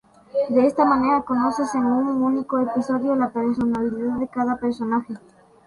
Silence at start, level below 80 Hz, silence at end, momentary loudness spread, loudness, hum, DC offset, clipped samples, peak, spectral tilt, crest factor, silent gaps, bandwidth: 0.35 s; -56 dBFS; 0.5 s; 7 LU; -22 LUFS; none; under 0.1%; under 0.1%; -6 dBFS; -6.5 dB/octave; 16 dB; none; 11.5 kHz